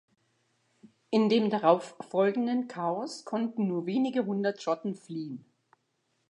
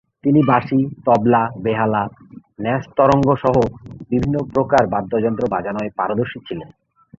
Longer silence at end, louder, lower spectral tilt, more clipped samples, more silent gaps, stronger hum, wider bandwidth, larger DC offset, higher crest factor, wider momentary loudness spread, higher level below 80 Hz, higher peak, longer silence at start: first, 0.9 s vs 0.5 s; second, -29 LUFS vs -18 LUFS; second, -6.5 dB/octave vs -8.5 dB/octave; neither; neither; neither; first, 11 kHz vs 7.6 kHz; neither; first, 22 dB vs 16 dB; about the same, 12 LU vs 11 LU; second, -86 dBFS vs -46 dBFS; second, -8 dBFS vs -2 dBFS; first, 1.1 s vs 0.25 s